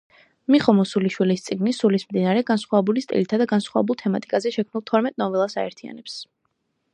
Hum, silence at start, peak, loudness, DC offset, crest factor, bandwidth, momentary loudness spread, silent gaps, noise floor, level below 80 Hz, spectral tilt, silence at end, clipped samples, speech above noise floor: none; 0.5 s; -2 dBFS; -22 LUFS; under 0.1%; 20 dB; 9.8 kHz; 12 LU; none; -73 dBFS; -68 dBFS; -6.5 dB/octave; 0.7 s; under 0.1%; 52 dB